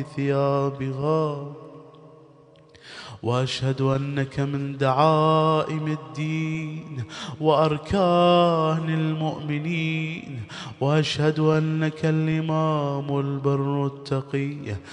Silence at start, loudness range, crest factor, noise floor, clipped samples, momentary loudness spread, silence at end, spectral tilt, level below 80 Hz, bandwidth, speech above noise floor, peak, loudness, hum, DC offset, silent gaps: 0 s; 6 LU; 18 dB; -52 dBFS; under 0.1%; 14 LU; 0 s; -7 dB/octave; -56 dBFS; 10 kHz; 29 dB; -6 dBFS; -24 LUFS; none; under 0.1%; none